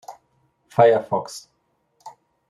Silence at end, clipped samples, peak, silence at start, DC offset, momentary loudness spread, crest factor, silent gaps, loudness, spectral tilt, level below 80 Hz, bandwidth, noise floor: 0.4 s; under 0.1%; -2 dBFS; 0.1 s; under 0.1%; 20 LU; 22 dB; none; -19 LUFS; -5.5 dB/octave; -68 dBFS; 13 kHz; -67 dBFS